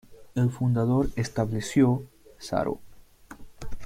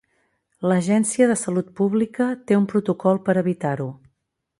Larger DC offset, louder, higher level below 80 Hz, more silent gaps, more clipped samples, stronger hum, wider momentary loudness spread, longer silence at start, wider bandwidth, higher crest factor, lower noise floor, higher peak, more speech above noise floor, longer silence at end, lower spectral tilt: neither; second, -26 LUFS vs -21 LUFS; first, -44 dBFS vs -64 dBFS; neither; neither; neither; first, 17 LU vs 7 LU; second, 0.1 s vs 0.6 s; first, 15 kHz vs 11.5 kHz; about the same, 16 dB vs 16 dB; second, -48 dBFS vs -75 dBFS; second, -10 dBFS vs -4 dBFS; second, 24 dB vs 55 dB; second, 0 s vs 0.65 s; about the same, -7 dB/octave vs -6.5 dB/octave